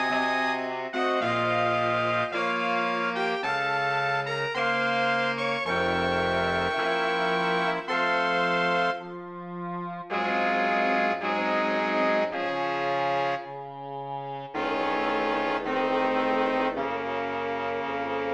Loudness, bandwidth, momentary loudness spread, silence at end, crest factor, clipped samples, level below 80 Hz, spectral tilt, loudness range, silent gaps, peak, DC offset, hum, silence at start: -26 LUFS; 10.5 kHz; 9 LU; 0 s; 16 dB; under 0.1%; -62 dBFS; -5 dB/octave; 3 LU; none; -12 dBFS; under 0.1%; none; 0 s